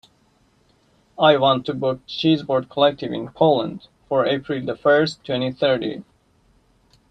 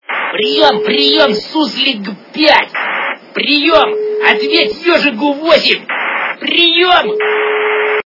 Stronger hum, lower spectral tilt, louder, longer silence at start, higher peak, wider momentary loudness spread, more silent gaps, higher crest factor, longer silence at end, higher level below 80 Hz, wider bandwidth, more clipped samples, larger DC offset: neither; first, -6.5 dB/octave vs -4 dB/octave; second, -20 LUFS vs -11 LUFS; first, 1.2 s vs 0.1 s; about the same, -2 dBFS vs 0 dBFS; first, 11 LU vs 7 LU; neither; first, 18 dB vs 12 dB; first, 1.1 s vs 0.05 s; second, -60 dBFS vs -52 dBFS; first, 8.6 kHz vs 6 kHz; second, under 0.1% vs 0.4%; neither